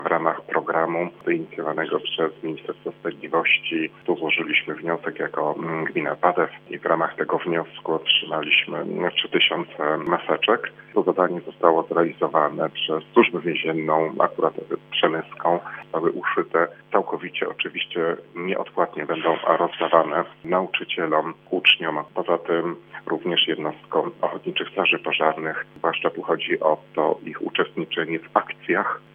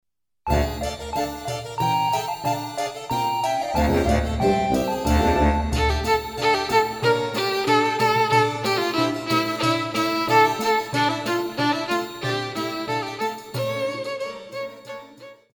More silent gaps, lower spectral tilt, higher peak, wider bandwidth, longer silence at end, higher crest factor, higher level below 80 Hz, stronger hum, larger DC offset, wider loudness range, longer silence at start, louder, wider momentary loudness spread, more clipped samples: neither; first, -7 dB/octave vs -5 dB/octave; first, 0 dBFS vs -6 dBFS; second, 4.5 kHz vs 19 kHz; about the same, 0.15 s vs 0.2 s; first, 24 dB vs 16 dB; second, -76 dBFS vs -34 dBFS; neither; neither; about the same, 3 LU vs 5 LU; second, 0 s vs 0.45 s; about the same, -23 LUFS vs -22 LUFS; about the same, 8 LU vs 10 LU; neither